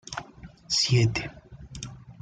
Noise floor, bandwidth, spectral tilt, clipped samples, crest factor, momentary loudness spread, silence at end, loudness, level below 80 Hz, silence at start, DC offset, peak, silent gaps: -47 dBFS; 9.4 kHz; -4 dB/octave; under 0.1%; 18 dB; 21 LU; 0.1 s; -24 LUFS; -50 dBFS; 0.1 s; under 0.1%; -12 dBFS; none